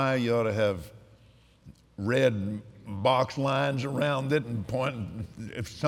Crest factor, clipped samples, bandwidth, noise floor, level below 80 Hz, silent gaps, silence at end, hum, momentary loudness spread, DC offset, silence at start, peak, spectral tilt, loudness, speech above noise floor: 18 dB; under 0.1%; 15.5 kHz; -58 dBFS; -60 dBFS; none; 0 s; none; 13 LU; under 0.1%; 0 s; -10 dBFS; -6.5 dB/octave; -28 LUFS; 30 dB